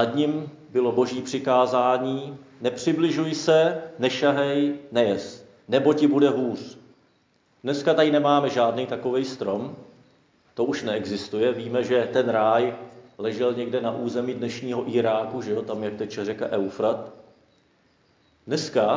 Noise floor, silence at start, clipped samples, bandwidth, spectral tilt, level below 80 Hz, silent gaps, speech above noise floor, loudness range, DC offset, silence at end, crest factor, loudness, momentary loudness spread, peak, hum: -64 dBFS; 0 s; under 0.1%; 7.6 kHz; -5.5 dB/octave; -68 dBFS; none; 41 dB; 5 LU; under 0.1%; 0 s; 18 dB; -24 LUFS; 11 LU; -6 dBFS; none